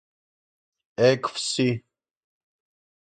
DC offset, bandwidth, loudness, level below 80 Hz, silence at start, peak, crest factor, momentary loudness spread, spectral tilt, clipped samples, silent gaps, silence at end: under 0.1%; 9.4 kHz; -24 LUFS; -68 dBFS; 1 s; -6 dBFS; 20 dB; 12 LU; -4.5 dB/octave; under 0.1%; none; 1.25 s